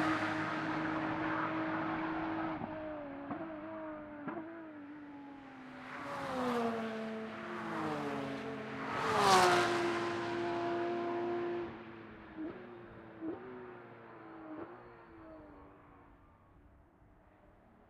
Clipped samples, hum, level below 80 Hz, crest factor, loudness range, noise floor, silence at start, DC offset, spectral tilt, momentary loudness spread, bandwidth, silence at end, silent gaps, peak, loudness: under 0.1%; none; -68 dBFS; 26 dB; 18 LU; -63 dBFS; 0 s; under 0.1%; -4.5 dB/octave; 18 LU; 15.5 kHz; 0.05 s; none; -12 dBFS; -37 LUFS